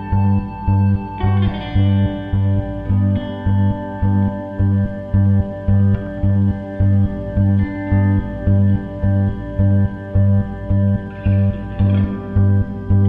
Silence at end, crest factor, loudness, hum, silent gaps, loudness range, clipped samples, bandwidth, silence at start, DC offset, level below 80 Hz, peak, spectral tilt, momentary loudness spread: 0 s; 12 dB; -18 LUFS; none; none; 1 LU; under 0.1%; 3.8 kHz; 0 s; under 0.1%; -30 dBFS; -4 dBFS; -11 dB/octave; 4 LU